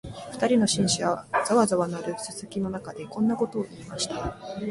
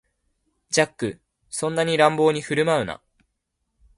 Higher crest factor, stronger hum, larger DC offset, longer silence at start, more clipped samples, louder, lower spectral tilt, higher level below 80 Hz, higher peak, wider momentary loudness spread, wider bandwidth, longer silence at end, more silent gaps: about the same, 18 dB vs 22 dB; neither; neither; second, 0.05 s vs 0.7 s; neither; second, -26 LUFS vs -22 LUFS; about the same, -4.5 dB/octave vs -4 dB/octave; first, -54 dBFS vs -60 dBFS; second, -8 dBFS vs -2 dBFS; about the same, 13 LU vs 13 LU; about the same, 11.5 kHz vs 11.5 kHz; second, 0 s vs 1.05 s; neither